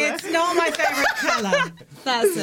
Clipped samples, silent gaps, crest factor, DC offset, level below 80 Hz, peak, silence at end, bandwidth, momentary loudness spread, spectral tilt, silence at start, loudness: under 0.1%; none; 14 dB; under 0.1%; -60 dBFS; -8 dBFS; 0 s; 17 kHz; 5 LU; -2.5 dB/octave; 0 s; -21 LUFS